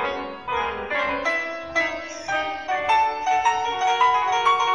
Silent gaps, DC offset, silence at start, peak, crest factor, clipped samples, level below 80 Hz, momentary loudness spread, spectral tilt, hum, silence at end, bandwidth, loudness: none; 0.2%; 0 s; -8 dBFS; 14 dB; under 0.1%; -54 dBFS; 8 LU; -2 dB/octave; none; 0 s; 10 kHz; -22 LUFS